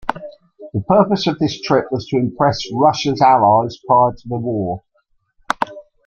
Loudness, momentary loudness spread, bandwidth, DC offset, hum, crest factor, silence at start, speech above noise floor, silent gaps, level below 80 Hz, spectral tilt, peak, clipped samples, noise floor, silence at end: -17 LUFS; 13 LU; 9.8 kHz; under 0.1%; none; 16 dB; 0.05 s; 48 dB; none; -52 dBFS; -6 dB/octave; 0 dBFS; under 0.1%; -63 dBFS; 0.25 s